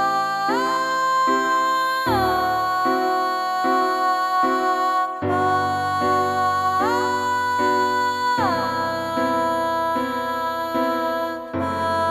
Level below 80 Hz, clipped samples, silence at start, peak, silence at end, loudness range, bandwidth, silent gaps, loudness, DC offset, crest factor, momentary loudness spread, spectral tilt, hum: -54 dBFS; under 0.1%; 0 s; -8 dBFS; 0 s; 2 LU; 15 kHz; none; -21 LUFS; under 0.1%; 12 dB; 4 LU; -4.5 dB/octave; none